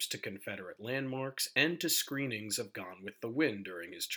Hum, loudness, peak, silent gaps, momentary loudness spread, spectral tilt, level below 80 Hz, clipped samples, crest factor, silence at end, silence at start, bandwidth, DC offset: none; -35 LUFS; -14 dBFS; none; 13 LU; -3 dB/octave; -84 dBFS; under 0.1%; 22 dB; 0 s; 0 s; over 20 kHz; under 0.1%